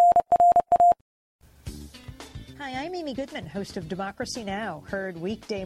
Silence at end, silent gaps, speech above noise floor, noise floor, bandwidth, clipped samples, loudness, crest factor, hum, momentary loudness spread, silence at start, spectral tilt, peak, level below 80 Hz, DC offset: 0 s; 1.01-1.39 s; 11 dB; -44 dBFS; 12 kHz; under 0.1%; -25 LUFS; 14 dB; none; 23 LU; 0 s; -5 dB/octave; -12 dBFS; -52 dBFS; under 0.1%